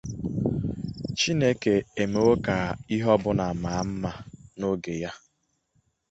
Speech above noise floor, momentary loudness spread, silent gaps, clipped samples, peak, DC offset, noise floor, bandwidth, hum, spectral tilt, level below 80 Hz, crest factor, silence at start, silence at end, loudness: 48 dB; 11 LU; none; under 0.1%; -8 dBFS; under 0.1%; -73 dBFS; 8.2 kHz; none; -5.5 dB/octave; -48 dBFS; 18 dB; 0.05 s; 0.95 s; -26 LUFS